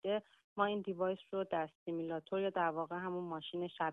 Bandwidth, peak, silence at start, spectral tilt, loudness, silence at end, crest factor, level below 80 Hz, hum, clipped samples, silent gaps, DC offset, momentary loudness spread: 4 kHz; -20 dBFS; 0.05 s; -8 dB/octave; -39 LUFS; 0 s; 20 dB; -82 dBFS; none; under 0.1%; 0.44-0.56 s, 1.75-1.86 s; under 0.1%; 6 LU